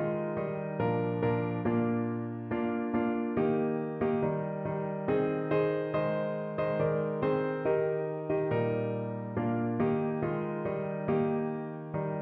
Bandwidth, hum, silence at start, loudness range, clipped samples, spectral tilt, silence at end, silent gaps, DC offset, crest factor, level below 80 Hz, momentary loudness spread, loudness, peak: 4.5 kHz; none; 0 s; 1 LU; under 0.1%; -8 dB/octave; 0 s; none; under 0.1%; 14 dB; -62 dBFS; 5 LU; -31 LUFS; -16 dBFS